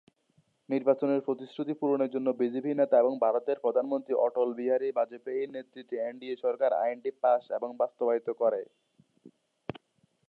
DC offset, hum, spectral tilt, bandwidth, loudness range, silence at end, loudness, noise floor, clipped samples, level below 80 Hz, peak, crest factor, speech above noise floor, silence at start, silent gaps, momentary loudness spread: under 0.1%; none; -9 dB/octave; 4.6 kHz; 3 LU; 1 s; -29 LUFS; -71 dBFS; under 0.1%; -80 dBFS; -12 dBFS; 18 dB; 43 dB; 0.7 s; none; 10 LU